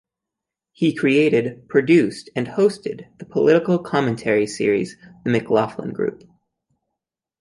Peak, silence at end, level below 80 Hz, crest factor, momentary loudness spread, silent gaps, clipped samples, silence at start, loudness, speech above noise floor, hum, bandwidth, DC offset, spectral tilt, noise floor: -2 dBFS; 1.25 s; -62 dBFS; 18 dB; 12 LU; none; under 0.1%; 0.8 s; -20 LUFS; 66 dB; none; 11.5 kHz; under 0.1%; -6.5 dB/octave; -85 dBFS